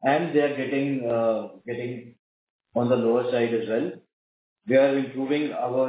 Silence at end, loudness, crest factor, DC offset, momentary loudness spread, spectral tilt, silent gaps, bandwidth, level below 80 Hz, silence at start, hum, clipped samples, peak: 0 s; -25 LUFS; 16 dB; under 0.1%; 12 LU; -10.5 dB/octave; 2.19-2.59 s, 4.13-4.56 s; 4 kHz; -72 dBFS; 0 s; none; under 0.1%; -8 dBFS